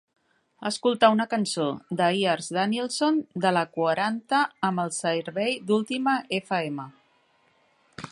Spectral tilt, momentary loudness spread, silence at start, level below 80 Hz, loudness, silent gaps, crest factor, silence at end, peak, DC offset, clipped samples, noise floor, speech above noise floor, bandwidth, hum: -4.5 dB/octave; 8 LU; 0.6 s; -72 dBFS; -25 LUFS; none; 20 dB; 0 s; -6 dBFS; under 0.1%; under 0.1%; -65 dBFS; 40 dB; 11.5 kHz; none